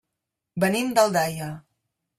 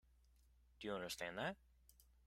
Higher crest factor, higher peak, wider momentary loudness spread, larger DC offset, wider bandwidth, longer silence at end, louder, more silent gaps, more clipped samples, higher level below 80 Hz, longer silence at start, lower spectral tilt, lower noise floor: about the same, 20 dB vs 22 dB; first, -6 dBFS vs -30 dBFS; first, 17 LU vs 8 LU; neither; about the same, 16 kHz vs 16 kHz; first, 0.6 s vs 0.25 s; first, -23 LUFS vs -47 LUFS; neither; neither; first, -64 dBFS vs -72 dBFS; second, 0.55 s vs 0.8 s; about the same, -4.5 dB/octave vs -3.5 dB/octave; first, -84 dBFS vs -72 dBFS